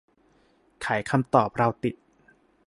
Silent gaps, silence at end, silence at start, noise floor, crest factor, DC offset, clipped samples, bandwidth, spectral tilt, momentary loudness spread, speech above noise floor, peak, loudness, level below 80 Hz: none; 0.75 s; 0.8 s; -63 dBFS; 24 dB; under 0.1%; under 0.1%; 11.5 kHz; -7 dB/octave; 12 LU; 39 dB; -4 dBFS; -25 LUFS; -60 dBFS